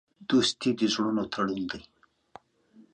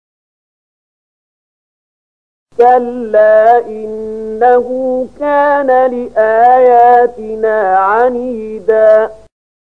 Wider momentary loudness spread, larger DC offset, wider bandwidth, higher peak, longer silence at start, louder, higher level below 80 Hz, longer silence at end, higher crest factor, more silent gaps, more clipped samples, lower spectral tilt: second, 10 LU vs 14 LU; second, under 0.1% vs 0.7%; first, 9.8 kHz vs 5.4 kHz; second, -12 dBFS vs 0 dBFS; second, 0.2 s vs 2.6 s; second, -27 LUFS vs -10 LUFS; second, -64 dBFS vs -52 dBFS; second, 0.15 s vs 0.55 s; about the same, 16 dB vs 12 dB; neither; neither; second, -4 dB/octave vs -6.5 dB/octave